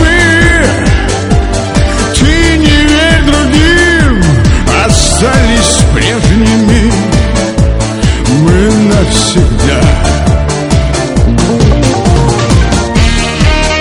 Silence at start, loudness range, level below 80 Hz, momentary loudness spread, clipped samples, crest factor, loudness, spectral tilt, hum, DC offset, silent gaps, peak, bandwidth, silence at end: 0 s; 2 LU; -12 dBFS; 5 LU; 1%; 6 dB; -8 LUFS; -5 dB/octave; none; under 0.1%; none; 0 dBFS; 11.5 kHz; 0 s